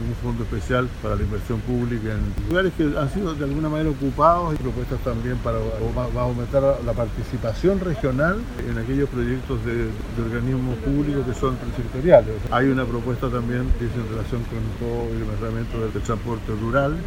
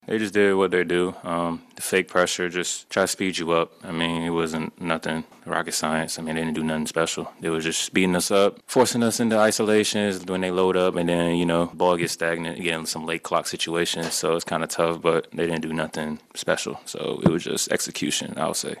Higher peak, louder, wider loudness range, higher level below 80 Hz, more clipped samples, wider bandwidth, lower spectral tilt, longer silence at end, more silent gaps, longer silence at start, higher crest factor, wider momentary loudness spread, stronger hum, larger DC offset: about the same, 0 dBFS vs 0 dBFS; about the same, -23 LUFS vs -24 LUFS; about the same, 4 LU vs 4 LU; first, -30 dBFS vs -58 dBFS; neither; about the same, 16 kHz vs 15 kHz; first, -7.5 dB/octave vs -4 dB/octave; about the same, 0 s vs 0 s; neither; about the same, 0 s vs 0.1 s; about the same, 22 dB vs 24 dB; about the same, 7 LU vs 8 LU; neither; neither